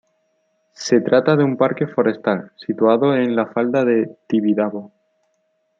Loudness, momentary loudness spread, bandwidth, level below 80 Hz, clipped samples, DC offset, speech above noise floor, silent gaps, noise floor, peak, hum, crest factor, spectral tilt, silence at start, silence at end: -18 LUFS; 9 LU; 7.6 kHz; -68 dBFS; under 0.1%; under 0.1%; 50 dB; none; -67 dBFS; -2 dBFS; none; 18 dB; -6.5 dB/octave; 0.8 s; 0.95 s